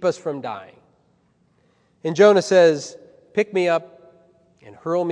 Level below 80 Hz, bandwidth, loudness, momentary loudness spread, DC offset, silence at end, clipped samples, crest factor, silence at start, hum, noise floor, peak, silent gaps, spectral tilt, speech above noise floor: -74 dBFS; 10 kHz; -19 LUFS; 18 LU; under 0.1%; 0 s; under 0.1%; 18 dB; 0 s; none; -62 dBFS; -2 dBFS; none; -5 dB/octave; 44 dB